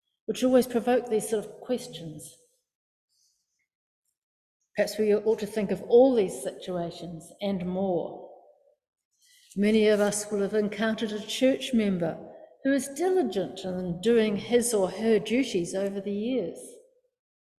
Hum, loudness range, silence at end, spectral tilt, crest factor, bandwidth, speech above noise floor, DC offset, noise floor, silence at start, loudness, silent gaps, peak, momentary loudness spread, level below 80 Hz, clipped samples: none; 8 LU; 0.8 s; -5 dB/octave; 18 dB; 14.5 kHz; 48 dB; under 0.1%; -74 dBFS; 0.3 s; -27 LUFS; 2.75-3.08 s, 3.75-4.03 s, 4.17-4.60 s, 8.88-8.93 s, 9.05-9.11 s; -10 dBFS; 15 LU; -64 dBFS; under 0.1%